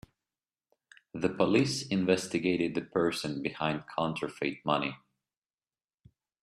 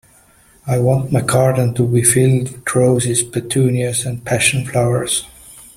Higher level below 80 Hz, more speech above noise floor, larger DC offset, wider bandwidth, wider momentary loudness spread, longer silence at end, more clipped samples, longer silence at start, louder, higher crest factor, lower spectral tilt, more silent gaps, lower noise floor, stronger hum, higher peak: second, -68 dBFS vs -46 dBFS; first, over 60 dB vs 34 dB; neither; second, 13.5 kHz vs 15.5 kHz; about the same, 8 LU vs 7 LU; first, 1.45 s vs 0.15 s; neither; first, 1.15 s vs 0.65 s; second, -31 LUFS vs -15 LUFS; first, 22 dB vs 16 dB; about the same, -5 dB/octave vs -5 dB/octave; neither; first, under -90 dBFS vs -50 dBFS; neither; second, -10 dBFS vs 0 dBFS